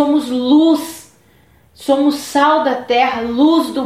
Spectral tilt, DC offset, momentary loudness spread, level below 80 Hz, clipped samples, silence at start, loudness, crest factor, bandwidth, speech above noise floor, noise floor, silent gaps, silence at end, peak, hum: -3.5 dB/octave; under 0.1%; 8 LU; -54 dBFS; under 0.1%; 0 s; -14 LUFS; 12 dB; 15 kHz; 37 dB; -50 dBFS; none; 0 s; -2 dBFS; none